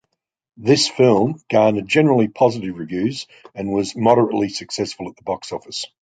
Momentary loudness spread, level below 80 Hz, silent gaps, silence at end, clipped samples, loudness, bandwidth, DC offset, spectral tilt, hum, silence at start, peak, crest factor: 13 LU; -56 dBFS; none; 0.15 s; under 0.1%; -18 LUFS; 9.4 kHz; under 0.1%; -5 dB/octave; none; 0.6 s; -2 dBFS; 18 dB